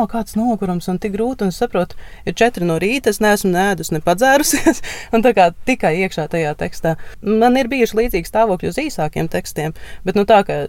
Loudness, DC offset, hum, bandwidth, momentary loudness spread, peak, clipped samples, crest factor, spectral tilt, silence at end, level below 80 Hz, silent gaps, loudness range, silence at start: -17 LUFS; under 0.1%; none; 17 kHz; 9 LU; 0 dBFS; under 0.1%; 16 dB; -5 dB/octave; 0 s; -36 dBFS; none; 3 LU; 0 s